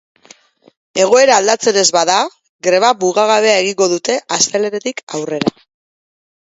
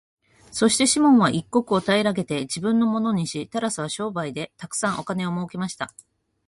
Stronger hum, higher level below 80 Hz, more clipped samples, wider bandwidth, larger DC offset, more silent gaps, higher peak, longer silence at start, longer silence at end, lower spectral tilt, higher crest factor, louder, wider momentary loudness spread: neither; about the same, -62 dBFS vs -60 dBFS; neither; second, 8 kHz vs 11.5 kHz; neither; first, 2.49-2.59 s, 5.03-5.07 s vs none; first, 0 dBFS vs -6 dBFS; first, 0.95 s vs 0.5 s; first, 1 s vs 0.6 s; second, -2 dB/octave vs -4 dB/octave; about the same, 14 dB vs 16 dB; first, -13 LUFS vs -22 LUFS; about the same, 12 LU vs 13 LU